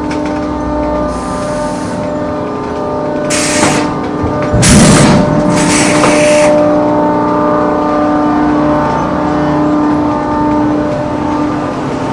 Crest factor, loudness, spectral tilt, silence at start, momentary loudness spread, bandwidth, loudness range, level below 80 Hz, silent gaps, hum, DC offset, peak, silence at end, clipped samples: 10 dB; -11 LUFS; -5 dB/octave; 0 s; 9 LU; 12 kHz; 6 LU; -30 dBFS; none; none; under 0.1%; 0 dBFS; 0 s; 0.3%